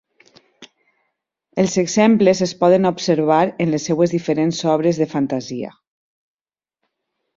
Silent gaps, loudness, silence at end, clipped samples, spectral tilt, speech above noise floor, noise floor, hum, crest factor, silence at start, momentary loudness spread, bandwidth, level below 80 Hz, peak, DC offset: none; -17 LUFS; 1.7 s; under 0.1%; -5.5 dB/octave; over 73 dB; under -90 dBFS; none; 18 dB; 0.6 s; 9 LU; 7.8 kHz; -58 dBFS; -2 dBFS; under 0.1%